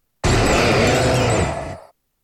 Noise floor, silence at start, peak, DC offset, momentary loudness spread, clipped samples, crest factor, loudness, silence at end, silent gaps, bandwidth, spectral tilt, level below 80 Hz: -42 dBFS; 0.25 s; -4 dBFS; under 0.1%; 11 LU; under 0.1%; 14 dB; -17 LUFS; 0.45 s; none; 14.5 kHz; -4.5 dB/octave; -30 dBFS